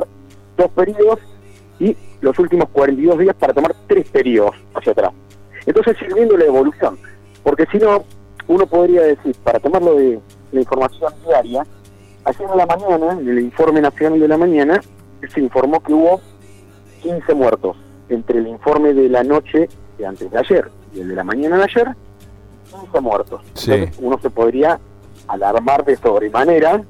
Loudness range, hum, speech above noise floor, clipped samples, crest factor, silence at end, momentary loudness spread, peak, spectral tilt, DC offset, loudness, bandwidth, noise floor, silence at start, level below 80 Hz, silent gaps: 4 LU; 50 Hz at -45 dBFS; 28 dB; under 0.1%; 14 dB; 0.05 s; 11 LU; -2 dBFS; -7.5 dB/octave; under 0.1%; -15 LUFS; 13.5 kHz; -42 dBFS; 0 s; -46 dBFS; none